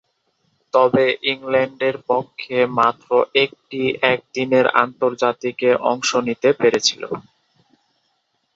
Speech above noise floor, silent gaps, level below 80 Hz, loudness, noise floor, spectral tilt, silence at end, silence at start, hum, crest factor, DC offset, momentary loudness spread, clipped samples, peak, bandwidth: 50 dB; none; -62 dBFS; -18 LUFS; -69 dBFS; -3.5 dB/octave; 1.35 s; 0.75 s; none; 20 dB; under 0.1%; 7 LU; under 0.1%; 0 dBFS; 8 kHz